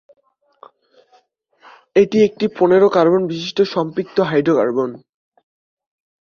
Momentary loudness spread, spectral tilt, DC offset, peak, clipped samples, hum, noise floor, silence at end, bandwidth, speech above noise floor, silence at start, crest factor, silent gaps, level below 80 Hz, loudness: 9 LU; -6.5 dB/octave; under 0.1%; -2 dBFS; under 0.1%; none; -57 dBFS; 1.25 s; 7 kHz; 42 dB; 1.95 s; 16 dB; none; -60 dBFS; -16 LUFS